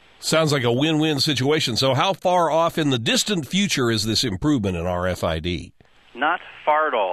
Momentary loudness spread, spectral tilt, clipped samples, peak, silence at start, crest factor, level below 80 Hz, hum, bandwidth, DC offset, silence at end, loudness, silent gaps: 5 LU; -4.5 dB/octave; under 0.1%; -6 dBFS; 0.2 s; 16 dB; -44 dBFS; none; 14.5 kHz; 0.1%; 0 s; -20 LUFS; none